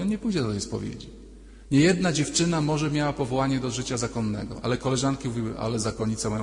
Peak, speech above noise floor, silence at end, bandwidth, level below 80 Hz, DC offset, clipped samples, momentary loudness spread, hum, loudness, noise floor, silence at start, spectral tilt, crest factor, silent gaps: -8 dBFS; 20 dB; 0 s; 11 kHz; -46 dBFS; under 0.1%; under 0.1%; 9 LU; none; -26 LUFS; -45 dBFS; 0 s; -5 dB/octave; 18 dB; none